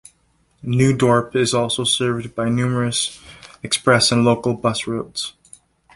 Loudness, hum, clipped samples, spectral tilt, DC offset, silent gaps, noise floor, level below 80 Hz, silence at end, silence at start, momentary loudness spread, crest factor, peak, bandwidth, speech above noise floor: -18 LUFS; none; under 0.1%; -4.5 dB/octave; under 0.1%; none; -61 dBFS; -52 dBFS; 0.65 s; 0.65 s; 12 LU; 18 dB; -2 dBFS; 11.5 kHz; 43 dB